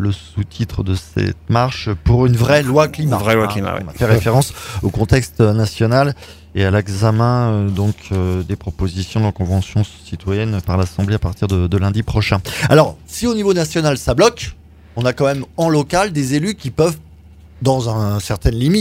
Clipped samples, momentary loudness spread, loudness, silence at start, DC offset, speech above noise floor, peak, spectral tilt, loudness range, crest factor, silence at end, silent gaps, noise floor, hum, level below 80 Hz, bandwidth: under 0.1%; 9 LU; -17 LUFS; 0 s; under 0.1%; 25 dB; 0 dBFS; -6 dB/octave; 3 LU; 16 dB; 0 s; none; -41 dBFS; none; -32 dBFS; 16 kHz